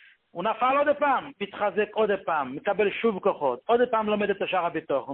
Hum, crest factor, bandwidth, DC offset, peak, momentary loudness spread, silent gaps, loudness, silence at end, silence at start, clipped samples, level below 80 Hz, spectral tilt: none; 16 dB; 4.1 kHz; under 0.1%; -10 dBFS; 6 LU; none; -26 LUFS; 0 s; 0.35 s; under 0.1%; -66 dBFS; -9.5 dB/octave